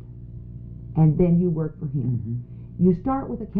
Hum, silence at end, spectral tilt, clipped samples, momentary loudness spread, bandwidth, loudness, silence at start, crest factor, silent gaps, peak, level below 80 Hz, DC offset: none; 0 s; -13 dB/octave; under 0.1%; 20 LU; 2.6 kHz; -23 LUFS; 0 s; 16 dB; none; -8 dBFS; -42 dBFS; under 0.1%